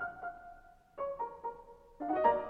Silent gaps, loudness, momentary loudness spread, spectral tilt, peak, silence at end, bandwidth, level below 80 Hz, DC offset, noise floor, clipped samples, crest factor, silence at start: none; -38 LUFS; 24 LU; -7 dB/octave; -14 dBFS; 0 s; 5 kHz; -64 dBFS; under 0.1%; -57 dBFS; under 0.1%; 24 dB; 0 s